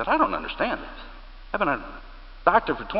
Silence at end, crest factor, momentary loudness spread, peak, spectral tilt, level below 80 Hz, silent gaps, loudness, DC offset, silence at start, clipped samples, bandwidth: 0 s; 22 dB; 21 LU; -4 dBFS; -9 dB/octave; -42 dBFS; none; -25 LUFS; under 0.1%; 0 s; under 0.1%; 5.8 kHz